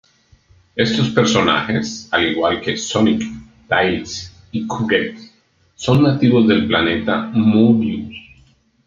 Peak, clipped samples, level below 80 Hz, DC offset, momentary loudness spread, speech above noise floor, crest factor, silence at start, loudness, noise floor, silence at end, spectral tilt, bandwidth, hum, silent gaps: 0 dBFS; under 0.1%; -50 dBFS; under 0.1%; 14 LU; 41 dB; 18 dB; 0.75 s; -17 LUFS; -56 dBFS; 0.65 s; -5.5 dB/octave; 7.6 kHz; none; none